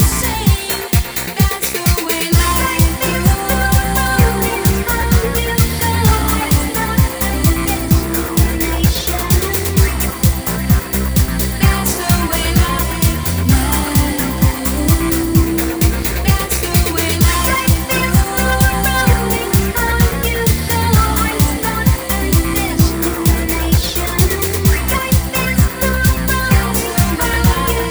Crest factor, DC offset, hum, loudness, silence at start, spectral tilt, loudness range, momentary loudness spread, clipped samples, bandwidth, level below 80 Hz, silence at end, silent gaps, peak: 14 dB; under 0.1%; none; -15 LUFS; 0 s; -4.5 dB/octave; 1 LU; 3 LU; under 0.1%; over 20 kHz; -20 dBFS; 0 s; none; 0 dBFS